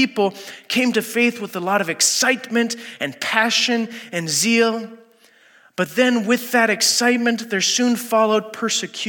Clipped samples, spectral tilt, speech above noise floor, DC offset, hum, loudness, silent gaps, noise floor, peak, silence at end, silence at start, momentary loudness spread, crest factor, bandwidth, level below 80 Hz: under 0.1%; -2 dB/octave; 33 dB; under 0.1%; none; -18 LUFS; none; -53 dBFS; 0 dBFS; 0 s; 0 s; 11 LU; 18 dB; 17.5 kHz; -82 dBFS